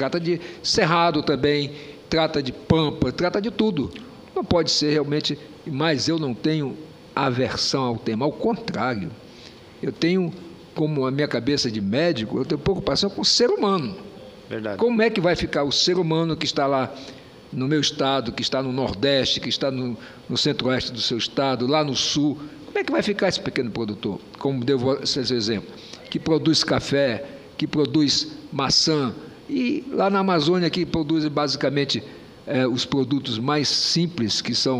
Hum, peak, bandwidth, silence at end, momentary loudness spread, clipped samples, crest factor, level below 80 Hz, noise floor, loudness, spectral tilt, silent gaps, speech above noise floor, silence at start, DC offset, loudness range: none; -2 dBFS; 11.5 kHz; 0 s; 12 LU; under 0.1%; 20 dB; -50 dBFS; -44 dBFS; -22 LUFS; -4.5 dB/octave; none; 22 dB; 0 s; under 0.1%; 3 LU